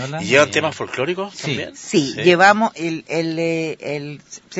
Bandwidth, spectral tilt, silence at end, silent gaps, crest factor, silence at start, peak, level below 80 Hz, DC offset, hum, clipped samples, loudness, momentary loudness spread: 8 kHz; -4.5 dB/octave; 0 s; none; 18 dB; 0 s; 0 dBFS; -62 dBFS; under 0.1%; none; under 0.1%; -18 LUFS; 14 LU